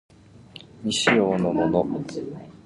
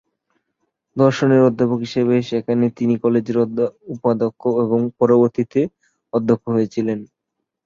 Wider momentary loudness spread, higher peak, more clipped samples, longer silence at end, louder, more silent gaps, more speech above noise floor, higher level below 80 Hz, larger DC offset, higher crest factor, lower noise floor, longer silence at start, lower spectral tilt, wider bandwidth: first, 18 LU vs 9 LU; second, -6 dBFS vs -2 dBFS; neither; second, 0.15 s vs 0.6 s; second, -23 LUFS vs -18 LUFS; neither; second, 24 dB vs 61 dB; first, -54 dBFS vs -60 dBFS; neither; about the same, 20 dB vs 16 dB; second, -47 dBFS vs -79 dBFS; second, 0.55 s vs 0.95 s; second, -4.5 dB/octave vs -8 dB/octave; first, 11.5 kHz vs 7.4 kHz